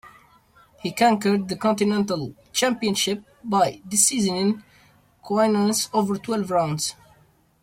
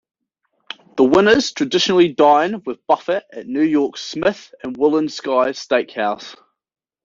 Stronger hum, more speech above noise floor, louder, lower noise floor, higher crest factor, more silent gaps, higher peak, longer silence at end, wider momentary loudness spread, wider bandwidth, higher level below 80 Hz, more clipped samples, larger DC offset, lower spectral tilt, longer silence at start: neither; second, 37 dB vs 53 dB; second, -22 LUFS vs -17 LUFS; second, -58 dBFS vs -70 dBFS; about the same, 20 dB vs 16 dB; neither; about the same, -4 dBFS vs -2 dBFS; about the same, 0.7 s vs 0.7 s; second, 9 LU vs 16 LU; first, 16.5 kHz vs 7.6 kHz; about the same, -62 dBFS vs -58 dBFS; neither; neither; about the same, -3.5 dB/octave vs -4.5 dB/octave; second, 0.05 s vs 0.95 s